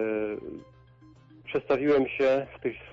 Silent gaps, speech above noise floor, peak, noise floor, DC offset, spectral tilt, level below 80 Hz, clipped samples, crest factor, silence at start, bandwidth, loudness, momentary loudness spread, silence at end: none; 29 dB; -14 dBFS; -55 dBFS; under 0.1%; -7 dB/octave; -60 dBFS; under 0.1%; 14 dB; 0 s; 7.2 kHz; -27 LUFS; 19 LU; 0 s